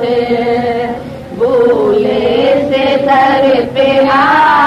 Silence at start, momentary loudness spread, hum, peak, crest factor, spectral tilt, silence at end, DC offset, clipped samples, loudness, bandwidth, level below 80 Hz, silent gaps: 0 s; 8 LU; none; 0 dBFS; 10 dB; -6 dB/octave; 0 s; under 0.1%; under 0.1%; -10 LUFS; 12 kHz; -42 dBFS; none